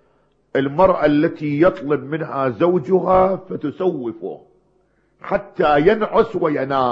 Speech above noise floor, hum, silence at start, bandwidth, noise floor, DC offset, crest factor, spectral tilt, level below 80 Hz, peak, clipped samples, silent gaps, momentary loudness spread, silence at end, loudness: 43 dB; none; 0.55 s; 6.4 kHz; -61 dBFS; under 0.1%; 18 dB; -9 dB/octave; -46 dBFS; 0 dBFS; under 0.1%; none; 12 LU; 0 s; -18 LUFS